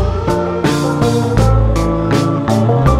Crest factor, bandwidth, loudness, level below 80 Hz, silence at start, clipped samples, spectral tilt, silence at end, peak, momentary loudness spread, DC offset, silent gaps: 12 dB; 14.5 kHz; -14 LUFS; -20 dBFS; 0 s; under 0.1%; -7 dB/octave; 0 s; 0 dBFS; 3 LU; under 0.1%; none